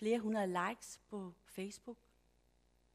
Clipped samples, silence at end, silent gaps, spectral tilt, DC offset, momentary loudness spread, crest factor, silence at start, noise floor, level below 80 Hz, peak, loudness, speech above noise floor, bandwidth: under 0.1%; 1 s; none; -5 dB/octave; under 0.1%; 17 LU; 18 dB; 0 s; -74 dBFS; -76 dBFS; -24 dBFS; -41 LUFS; 33 dB; 15.5 kHz